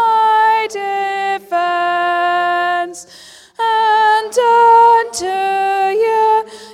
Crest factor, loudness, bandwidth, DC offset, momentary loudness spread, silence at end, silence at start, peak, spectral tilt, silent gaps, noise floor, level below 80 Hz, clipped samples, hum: 12 dB; -13 LUFS; 14 kHz; under 0.1%; 10 LU; 0 s; 0 s; -2 dBFS; -1.5 dB/octave; none; -40 dBFS; -60 dBFS; under 0.1%; none